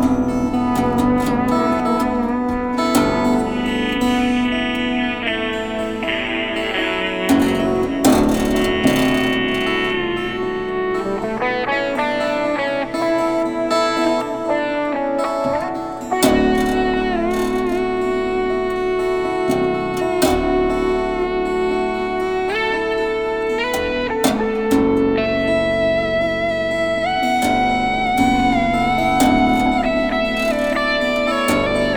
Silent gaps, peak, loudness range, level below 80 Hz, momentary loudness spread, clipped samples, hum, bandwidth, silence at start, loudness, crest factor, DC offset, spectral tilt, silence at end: none; -2 dBFS; 3 LU; -36 dBFS; 5 LU; under 0.1%; none; 19.5 kHz; 0 s; -18 LUFS; 16 dB; under 0.1%; -5 dB/octave; 0 s